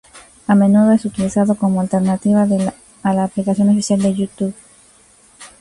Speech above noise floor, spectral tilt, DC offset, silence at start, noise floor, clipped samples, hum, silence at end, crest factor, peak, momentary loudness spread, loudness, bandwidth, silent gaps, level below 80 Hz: 35 dB; -7 dB/octave; under 0.1%; 0.15 s; -49 dBFS; under 0.1%; none; 0.15 s; 14 dB; -2 dBFS; 10 LU; -16 LUFS; 11.5 kHz; none; -52 dBFS